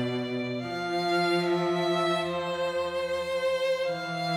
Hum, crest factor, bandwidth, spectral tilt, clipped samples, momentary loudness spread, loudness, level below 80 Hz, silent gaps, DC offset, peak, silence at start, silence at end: none; 14 dB; 15.5 kHz; -5.5 dB/octave; under 0.1%; 5 LU; -28 LUFS; -64 dBFS; none; under 0.1%; -14 dBFS; 0 s; 0 s